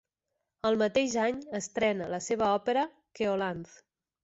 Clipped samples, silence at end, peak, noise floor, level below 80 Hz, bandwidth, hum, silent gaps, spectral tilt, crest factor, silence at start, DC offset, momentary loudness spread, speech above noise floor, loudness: under 0.1%; 0.6 s; -14 dBFS; -85 dBFS; -66 dBFS; 8.2 kHz; none; none; -4 dB/octave; 16 dB; 0.65 s; under 0.1%; 9 LU; 55 dB; -30 LUFS